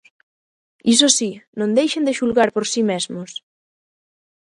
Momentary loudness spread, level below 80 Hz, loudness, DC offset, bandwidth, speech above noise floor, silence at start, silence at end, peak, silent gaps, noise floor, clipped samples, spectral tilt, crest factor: 14 LU; -64 dBFS; -18 LUFS; under 0.1%; 11.5 kHz; over 72 dB; 0.85 s; 1.05 s; 0 dBFS; 1.47-1.53 s; under -90 dBFS; under 0.1%; -2.5 dB/octave; 20 dB